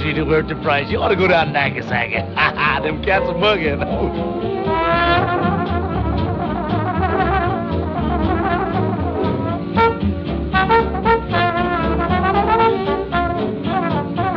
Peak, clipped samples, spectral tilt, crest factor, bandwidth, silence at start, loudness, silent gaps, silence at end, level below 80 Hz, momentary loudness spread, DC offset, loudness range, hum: -2 dBFS; under 0.1%; -8.5 dB/octave; 14 dB; 6.4 kHz; 0 s; -18 LUFS; none; 0 s; -32 dBFS; 6 LU; under 0.1%; 2 LU; none